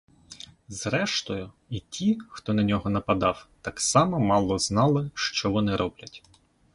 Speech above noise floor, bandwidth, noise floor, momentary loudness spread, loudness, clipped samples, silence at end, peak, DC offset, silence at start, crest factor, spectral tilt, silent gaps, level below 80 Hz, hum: 22 dB; 11.5 kHz; -47 dBFS; 15 LU; -26 LUFS; under 0.1%; 0.55 s; -6 dBFS; under 0.1%; 0.3 s; 20 dB; -4.5 dB/octave; none; -50 dBFS; none